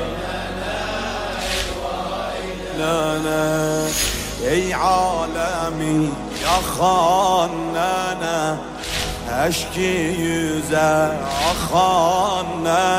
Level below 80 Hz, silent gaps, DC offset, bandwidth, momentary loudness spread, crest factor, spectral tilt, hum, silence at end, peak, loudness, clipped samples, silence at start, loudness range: -36 dBFS; none; under 0.1%; 16 kHz; 9 LU; 14 dB; -4 dB/octave; none; 0 s; -6 dBFS; -20 LUFS; under 0.1%; 0 s; 3 LU